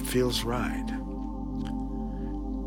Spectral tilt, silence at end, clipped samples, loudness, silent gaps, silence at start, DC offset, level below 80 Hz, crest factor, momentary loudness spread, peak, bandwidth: -5 dB/octave; 0 s; under 0.1%; -32 LUFS; none; 0 s; under 0.1%; -36 dBFS; 16 dB; 9 LU; -14 dBFS; 19 kHz